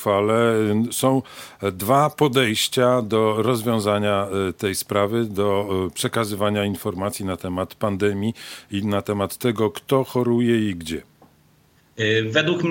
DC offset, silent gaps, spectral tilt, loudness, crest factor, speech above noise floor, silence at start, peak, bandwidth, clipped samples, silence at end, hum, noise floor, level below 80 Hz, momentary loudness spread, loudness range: under 0.1%; none; -5 dB/octave; -21 LUFS; 18 dB; 36 dB; 0 s; -4 dBFS; 17 kHz; under 0.1%; 0 s; none; -57 dBFS; -60 dBFS; 8 LU; 5 LU